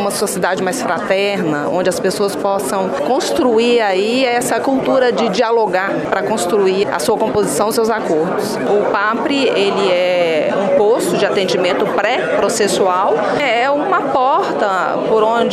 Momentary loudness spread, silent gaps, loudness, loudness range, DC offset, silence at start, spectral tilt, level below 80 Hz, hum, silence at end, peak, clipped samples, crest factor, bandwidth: 4 LU; none; -15 LUFS; 1 LU; under 0.1%; 0 s; -4 dB/octave; -54 dBFS; none; 0 s; 0 dBFS; under 0.1%; 14 dB; 15.5 kHz